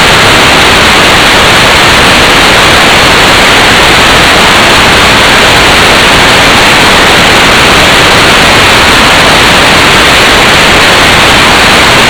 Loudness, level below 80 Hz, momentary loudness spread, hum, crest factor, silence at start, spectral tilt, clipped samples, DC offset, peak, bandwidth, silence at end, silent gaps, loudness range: -1 LUFS; -20 dBFS; 0 LU; none; 2 dB; 0 s; -2.5 dB/octave; 40%; 1%; 0 dBFS; over 20 kHz; 0 s; none; 0 LU